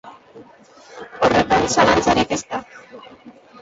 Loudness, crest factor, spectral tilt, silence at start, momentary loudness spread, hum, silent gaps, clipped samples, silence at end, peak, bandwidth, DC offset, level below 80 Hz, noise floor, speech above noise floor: -17 LUFS; 20 dB; -4 dB/octave; 0.05 s; 23 LU; none; none; under 0.1%; 0.3 s; -2 dBFS; 8 kHz; under 0.1%; -44 dBFS; -44 dBFS; 25 dB